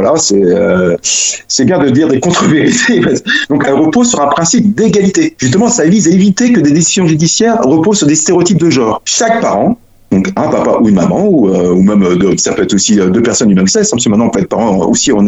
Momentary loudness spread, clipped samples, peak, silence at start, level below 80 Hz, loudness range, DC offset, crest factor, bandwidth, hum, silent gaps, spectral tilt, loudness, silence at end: 3 LU; under 0.1%; 0 dBFS; 0 s; -42 dBFS; 2 LU; under 0.1%; 8 dB; 8.2 kHz; none; none; -4.5 dB/octave; -9 LUFS; 0 s